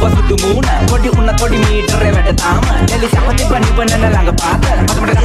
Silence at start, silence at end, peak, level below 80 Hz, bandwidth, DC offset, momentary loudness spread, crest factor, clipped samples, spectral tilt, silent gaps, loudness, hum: 0 s; 0 s; 0 dBFS; -14 dBFS; 14 kHz; under 0.1%; 1 LU; 10 dB; under 0.1%; -5 dB/octave; none; -12 LUFS; none